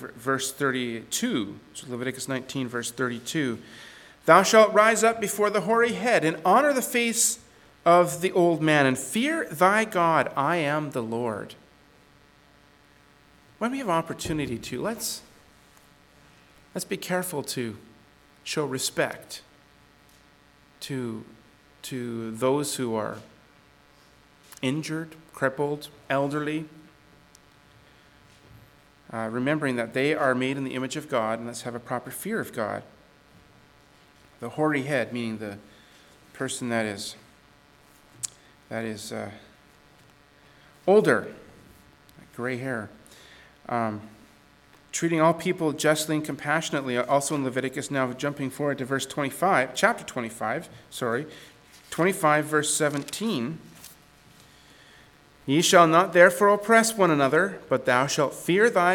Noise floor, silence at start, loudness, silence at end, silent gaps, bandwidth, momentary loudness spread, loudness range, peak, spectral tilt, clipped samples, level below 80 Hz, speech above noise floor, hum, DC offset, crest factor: -57 dBFS; 0 s; -25 LUFS; 0 s; none; 19 kHz; 16 LU; 13 LU; -2 dBFS; -4 dB/octave; under 0.1%; -64 dBFS; 32 dB; none; under 0.1%; 26 dB